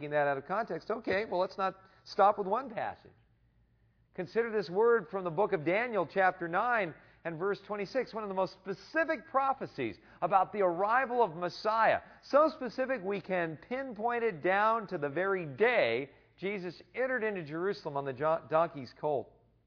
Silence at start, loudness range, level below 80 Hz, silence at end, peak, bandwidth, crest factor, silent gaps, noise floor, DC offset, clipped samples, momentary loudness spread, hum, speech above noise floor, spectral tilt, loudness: 0 s; 4 LU; -72 dBFS; 0.4 s; -12 dBFS; 5.4 kHz; 20 dB; none; -69 dBFS; under 0.1%; under 0.1%; 11 LU; none; 37 dB; -6.5 dB/octave; -32 LUFS